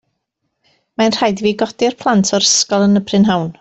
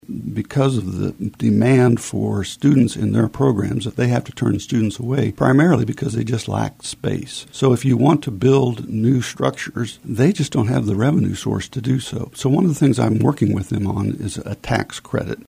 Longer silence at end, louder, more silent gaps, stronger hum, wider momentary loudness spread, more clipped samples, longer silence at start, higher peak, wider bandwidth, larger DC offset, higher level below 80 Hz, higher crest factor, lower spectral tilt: about the same, 0.1 s vs 0.1 s; first, -14 LUFS vs -19 LUFS; neither; neither; second, 6 LU vs 10 LU; neither; first, 1 s vs 0.1 s; about the same, -2 dBFS vs -2 dBFS; second, 8.2 kHz vs 15.5 kHz; neither; second, -54 dBFS vs -46 dBFS; about the same, 14 dB vs 16 dB; second, -4 dB/octave vs -7 dB/octave